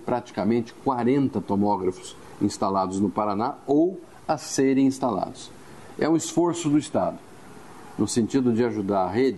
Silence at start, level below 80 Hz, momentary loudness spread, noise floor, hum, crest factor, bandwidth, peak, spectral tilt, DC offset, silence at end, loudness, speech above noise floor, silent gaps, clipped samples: 0 s; -60 dBFS; 13 LU; -45 dBFS; none; 16 dB; 12.5 kHz; -10 dBFS; -6 dB/octave; 0.2%; 0 s; -24 LUFS; 22 dB; none; under 0.1%